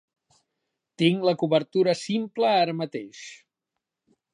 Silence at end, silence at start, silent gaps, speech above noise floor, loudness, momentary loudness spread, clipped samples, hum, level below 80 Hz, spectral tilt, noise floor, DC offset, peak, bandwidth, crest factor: 1 s; 1 s; none; 61 dB; -24 LUFS; 16 LU; under 0.1%; none; -78 dBFS; -6 dB/octave; -85 dBFS; under 0.1%; -6 dBFS; 10.5 kHz; 20 dB